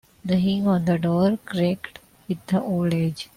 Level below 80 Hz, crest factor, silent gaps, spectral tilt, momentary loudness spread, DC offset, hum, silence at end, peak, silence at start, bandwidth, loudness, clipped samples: -56 dBFS; 12 dB; none; -7.5 dB/octave; 11 LU; under 0.1%; none; 0.1 s; -10 dBFS; 0.25 s; 15.5 kHz; -23 LUFS; under 0.1%